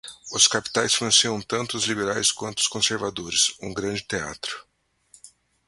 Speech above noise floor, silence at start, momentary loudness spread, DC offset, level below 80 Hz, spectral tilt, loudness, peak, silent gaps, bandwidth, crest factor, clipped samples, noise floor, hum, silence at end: 33 dB; 0.05 s; 12 LU; under 0.1%; -58 dBFS; -1.5 dB/octave; -22 LUFS; -4 dBFS; none; 12 kHz; 22 dB; under 0.1%; -57 dBFS; none; 0.4 s